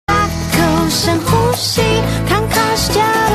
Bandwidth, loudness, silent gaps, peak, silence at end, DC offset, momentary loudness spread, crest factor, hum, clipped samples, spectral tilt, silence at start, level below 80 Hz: 14 kHz; -14 LUFS; none; 0 dBFS; 0 s; under 0.1%; 2 LU; 12 dB; none; under 0.1%; -4.5 dB/octave; 0.1 s; -28 dBFS